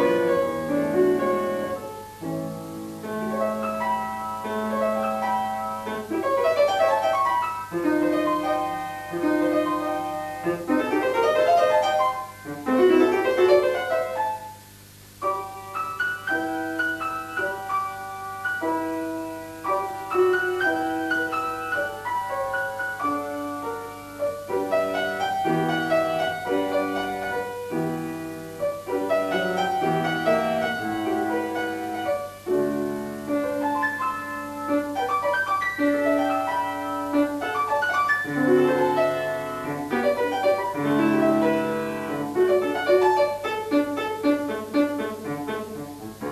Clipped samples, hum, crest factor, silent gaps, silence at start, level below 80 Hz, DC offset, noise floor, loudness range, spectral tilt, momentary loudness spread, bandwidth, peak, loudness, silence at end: under 0.1%; 50 Hz at -50 dBFS; 18 dB; none; 0 s; -60 dBFS; under 0.1%; -47 dBFS; 5 LU; -5.5 dB/octave; 11 LU; 13.5 kHz; -6 dBFS; -24 LUFS; 0 s